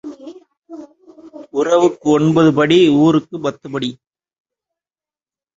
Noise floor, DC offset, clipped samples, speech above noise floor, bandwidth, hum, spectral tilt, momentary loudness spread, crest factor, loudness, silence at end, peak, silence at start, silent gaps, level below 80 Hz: under -90 dBFS; under 0.1%; under 0.1%; over 77 dB; 7.8 kHz; none; -6.5 dB/octave; 13 LU; 16 dB; -14 LUFS; 1.65 s; -2 dBFS; 0.05 s; none; -56 dBFS